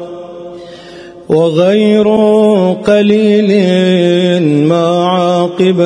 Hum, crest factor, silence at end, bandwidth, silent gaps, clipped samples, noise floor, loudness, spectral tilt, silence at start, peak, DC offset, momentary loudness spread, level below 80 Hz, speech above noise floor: none; 10 dB; 0 s; 10.5 kHz; none; under 0.1%; -31 dBFS; -10 LUFS; -7 dB/octave; 0 s; 0 dBFS; under 0.1%; 19 LU; -52 dBFS; 23 dB